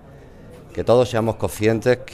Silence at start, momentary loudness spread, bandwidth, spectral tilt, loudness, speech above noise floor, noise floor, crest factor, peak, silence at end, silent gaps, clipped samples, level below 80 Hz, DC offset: 0.15 s; 9 LU; 15 kHz; -6 dB/octave; -20 LUFS; 24 dB; -42 dBFS; 18 dB; -4 dBFS; 0 s; none; under 0.1%; -44 dBFS; under 0.1%